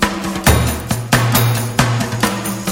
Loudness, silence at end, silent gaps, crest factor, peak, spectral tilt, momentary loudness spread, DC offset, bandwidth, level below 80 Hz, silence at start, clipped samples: -16 LUFS; 0 s; none; 16 dB; 0 dBFS; -4.5 dB/octave; 5 LU; under 0.1%; 17 kHz; -28 dBFS; 0 s; under 0.1%